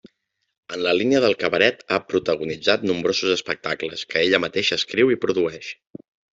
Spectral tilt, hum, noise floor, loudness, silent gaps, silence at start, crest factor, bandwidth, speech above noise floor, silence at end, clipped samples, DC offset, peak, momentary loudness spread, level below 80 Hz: -4 dB/octave; none; -73 dBFS; -21 LUFS; none; 0.7 s; 20 dB; 7.8 kHz; 52 dB; 0.65 s; under 0.1%; under 0.1%; -2 dBFS; 8 LU; -62 dBFS